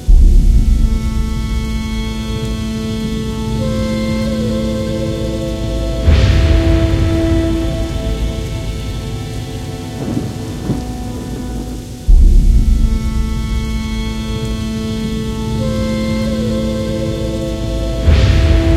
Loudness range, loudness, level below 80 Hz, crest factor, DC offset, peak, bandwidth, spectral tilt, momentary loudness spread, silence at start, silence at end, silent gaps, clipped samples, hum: 6 LU; -17 LUFS; -16 dBFS; 14 dB; under 0.1%; 0 dBFS; 13.5 kHz; -6.5 dB/octave; 11 LU; 0 s; 0 s; none; under 0.1%; none